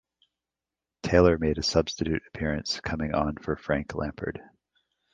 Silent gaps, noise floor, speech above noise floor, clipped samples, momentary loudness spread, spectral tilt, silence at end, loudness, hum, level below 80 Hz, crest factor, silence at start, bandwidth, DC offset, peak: none; -90 dBFS; 63 dB; under 0.1%; 13 LU; -5.5 dB/octave; 0.7 s; -27 LUFS; none; -42 dBFS; 24 dB; 1.05 s; 9.6 kHz; under 0.1%; -4 dBFS